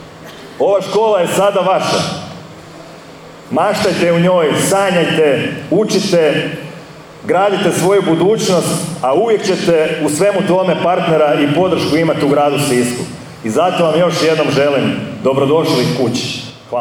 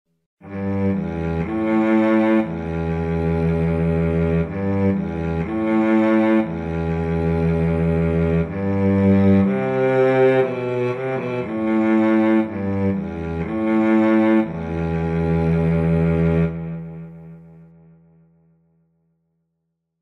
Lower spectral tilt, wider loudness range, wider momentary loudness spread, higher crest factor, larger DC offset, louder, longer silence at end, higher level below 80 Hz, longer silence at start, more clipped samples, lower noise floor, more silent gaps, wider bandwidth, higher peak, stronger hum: second, -5 dB/octave vs -10 dB/octave; about the same, 3 LU vs 4 LU; first, 13 LU vs 9 LU; about the same, 12 dB vs 14 dB; neither; first, -13 LUFS vs -19 LUFS; second, 0 s vs 2.4 s; second, -52 dBFS vs -38 dBFS; second, 0 s vs 0.45 s; neither; second, -35 dBFS vs -76 dBFS; neither; first, 19.5 kHz vs 5.8 kHz; first, -2 dBFS vs -6 dBFS; neither